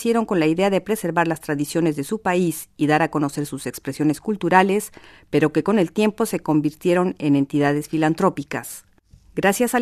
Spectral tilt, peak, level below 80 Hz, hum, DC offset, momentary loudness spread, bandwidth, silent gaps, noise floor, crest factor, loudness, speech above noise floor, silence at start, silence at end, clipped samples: -5.5 dB/octave; 0 dBFS; -56 dBFS; none; under 0.1%; 10 LU; 14 kHz; none; -51 dBFS; 20 dB; -21 LUFS; 30 dB; 0 s; 0 s; under 0.1%